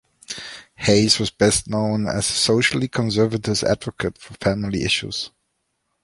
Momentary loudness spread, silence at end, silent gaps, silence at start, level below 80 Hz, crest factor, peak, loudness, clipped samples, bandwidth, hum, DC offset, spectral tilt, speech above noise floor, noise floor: 14 LU; 0.75 s; none; 0.3 s; -46 dBFS; 20 dB; -2 dBFS; -20 LUFS; under 0.1%; 11.5 kHz; none; under 0.1%; -4 dB/octave; 53 dB; -73 dBFS